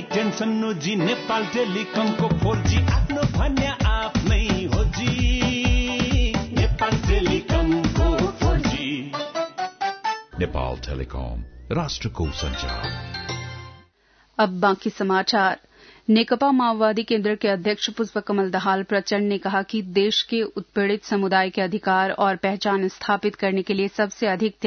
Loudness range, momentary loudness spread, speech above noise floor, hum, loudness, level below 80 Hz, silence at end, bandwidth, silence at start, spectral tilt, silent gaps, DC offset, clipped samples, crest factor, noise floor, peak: 7 LU; 8 LU; 37 dB; none; -23 LUFS; -30 dBFS; 0 s; 6.6 kHz; 0 s; -5.5 dB/octave; none; under 0.1%; under 0.1%; 16 dB; -59 dBFS; -6 dBFS